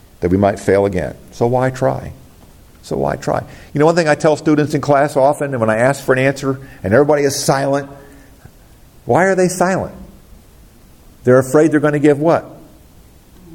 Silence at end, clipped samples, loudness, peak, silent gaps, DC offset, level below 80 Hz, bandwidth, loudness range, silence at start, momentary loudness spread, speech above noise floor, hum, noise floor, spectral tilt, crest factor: 0 s; under 0.1%; -15 LUFS; 0 dBFS; none; under 0.1%; -46 dBFS; 17 kHz; 4 LU; 0.2 s; 10 LU; 29 dB; none; -44 dBFS; -6 dB/octave; 16 dB